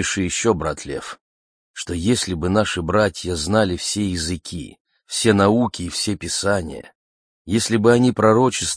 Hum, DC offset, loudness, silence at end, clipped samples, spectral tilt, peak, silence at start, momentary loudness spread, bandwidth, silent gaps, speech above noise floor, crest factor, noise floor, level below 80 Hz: none; under 0.1%; -19 LUFS; 0 s; under 0.1%; -4.5 dB/octave; -2 dBFS; 0 s; 16 LU; 10.5 kHz; 1.21-1.74 s, 4.80-4.85 s, 6.95-7.45 s; over 71 dB; 18 dB; under -90 dBFS; -44 dBFS